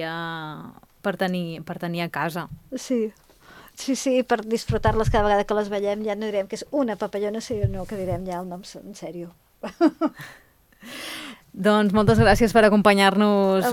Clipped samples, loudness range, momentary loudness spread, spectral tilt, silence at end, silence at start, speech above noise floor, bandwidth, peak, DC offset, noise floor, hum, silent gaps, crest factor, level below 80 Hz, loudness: under 0.1%; 9 LU; 20 LU; -5.5 dB/octave; 0 s; 0 s; 27 dB; 16.5 kHz; -2 dBFS; under 0.1%; -49 dBFS; none; none; 22 dB; -40 dBFS; -22 LUFS